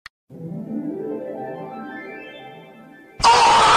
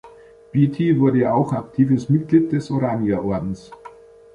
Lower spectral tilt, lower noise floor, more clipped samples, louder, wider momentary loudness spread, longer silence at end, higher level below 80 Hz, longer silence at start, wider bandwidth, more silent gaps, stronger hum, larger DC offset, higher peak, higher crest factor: second, -2.5 dB/octave vs -9.5 dB/octave; about the same, -45 dBFS vs -45 dBFS; neither; about the same, -18 LUFS vs -19 LUFS; first, 25 LU vs 8 LU; second, 0 s vs 0.45 s; about the same, -48 dBFS vs -50 dBFS; first, 0.3 s vs 0.05 s; first, 13.5 kHz vs 10 kHz; neither; neither; neither; about the same, -4 dBFS vs -4 dBFS; about the same, 16 dB vs 16 dB